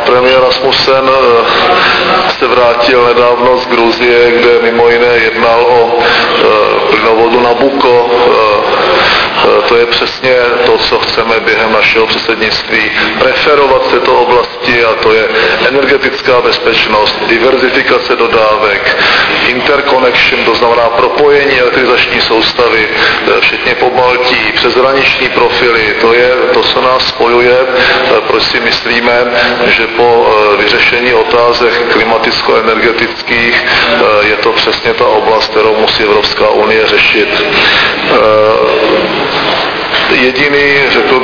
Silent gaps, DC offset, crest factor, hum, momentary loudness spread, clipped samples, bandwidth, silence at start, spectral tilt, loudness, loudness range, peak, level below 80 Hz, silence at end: none; 0.4%; 8 dB; none; 3 LU; 1%; 5.4 kHz; 0 s; -4.5 dB/octave; -7 LUFS; 1 LU; 0 dBFS; -36 dBFS; 0 s